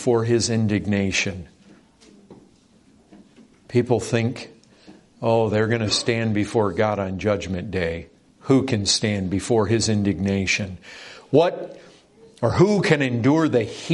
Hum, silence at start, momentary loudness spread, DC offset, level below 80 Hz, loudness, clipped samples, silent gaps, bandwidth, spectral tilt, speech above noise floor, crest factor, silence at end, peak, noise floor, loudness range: none; 0 s; 11 LU; under 0.1%; -54 dBFS; -21 LUFS; under 0.1%; none; 11.5 kHz; -5 dB/octave; 34 dB; 20 dB; 0 s; -2 dBFS; -55 dBFS; 7 LU